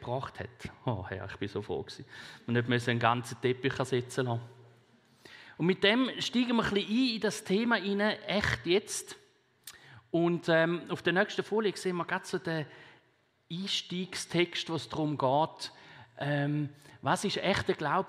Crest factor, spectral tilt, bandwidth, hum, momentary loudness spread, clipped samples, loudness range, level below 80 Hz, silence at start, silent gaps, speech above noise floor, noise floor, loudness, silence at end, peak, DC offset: 24 dB; -5 dB/octave; 15 kHz; none; 15 LU; under 0.1%; 4 LU; -62 dBFS; 0 s; none; 39 dB; -70 dBFS; -31 LUFS; 0 s; -8 dBFS; under 0.1%